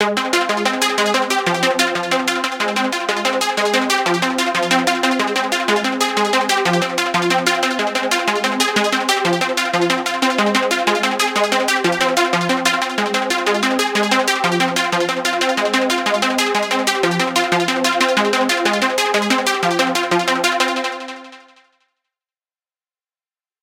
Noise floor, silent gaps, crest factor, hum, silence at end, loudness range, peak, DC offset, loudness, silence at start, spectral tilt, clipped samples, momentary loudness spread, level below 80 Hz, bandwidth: under -90 dBFS; none; 18 dB; none; 2.25 s; 1 LU; 0 dBFS; under 0.1%; -16 LUFS; 0 s; -2.5 dB/octave; under 0.1%; 2 LU; -66 dBFS; 17 kHz